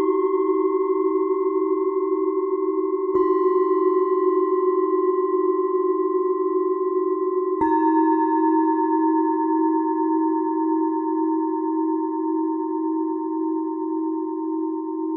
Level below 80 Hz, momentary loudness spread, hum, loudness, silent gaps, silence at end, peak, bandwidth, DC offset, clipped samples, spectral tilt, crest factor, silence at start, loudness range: -68 dBFS; 6 LU; none; -22 LUFS; none; 0 s; -8 dBFS; 2.2 kHz; under 0.1%; under 0.1%; -9.5 dB/octave; 12 dB; 0 s; 4 LU